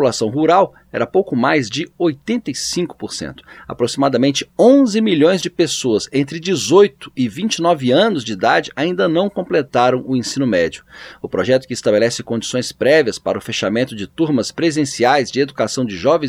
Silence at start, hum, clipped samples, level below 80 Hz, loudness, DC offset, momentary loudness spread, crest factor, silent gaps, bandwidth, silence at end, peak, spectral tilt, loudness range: 0 s; none; under 0.1%; -54 dBFS; -16 LUFS; under 0.1%; 9 LU; 16 dB; none; 15 kHz; 0 s; 0 dBFS; -4.5 dB/octave; 3 LU